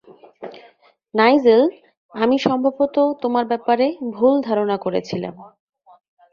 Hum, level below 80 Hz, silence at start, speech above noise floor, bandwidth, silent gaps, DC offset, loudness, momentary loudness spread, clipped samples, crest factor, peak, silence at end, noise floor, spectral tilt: none; -62 dBFS; 0.4 s; 35 dB; 7.2 kHz; 1.97-2.09 s; under 0.1%; -18 LUFS; 19 LU; under 0.1%; 18 dB; -2 dBFS; 0.85 s; -53 dBFS; -6.5 dB/octave